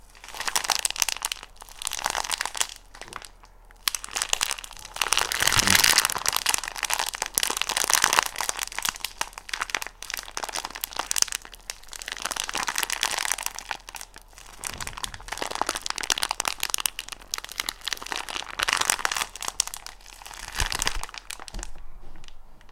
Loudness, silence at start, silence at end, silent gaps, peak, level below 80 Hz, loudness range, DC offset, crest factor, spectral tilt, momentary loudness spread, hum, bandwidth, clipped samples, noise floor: -26 LUFS; 0.05 s; 0 s; none; 0 dBFS; -46 dBFS; 8 LU; under 0.1%; 28 dB; 0.5 dB/octave; 17 LU; none; 16.5 kHz; under 0.1%; -50 dBFS